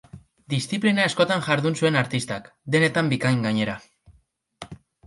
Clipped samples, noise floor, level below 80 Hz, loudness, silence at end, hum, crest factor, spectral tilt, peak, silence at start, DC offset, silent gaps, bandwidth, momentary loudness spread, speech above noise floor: under 0.1%; -63 dBFS; -60 dBFS; -23 LUFS; 0.3 s; none; 20 dB; -5.5 dB/octave; -4 dBFS; 0.15 s; under 0.1%; none; 11.5 kHz; 18 LU; 40 dB